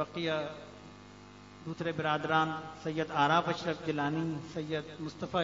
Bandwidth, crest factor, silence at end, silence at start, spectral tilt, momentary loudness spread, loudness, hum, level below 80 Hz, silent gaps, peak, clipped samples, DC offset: 7.4 kHz; 20 dB; 0 s; 0 s; -4 dB/octave; 23 LU; -33 LUFS; 50 Hz at -55 dBFS; -64 dBFS; none; -14 dBFS; under 0.1%; under 0.1%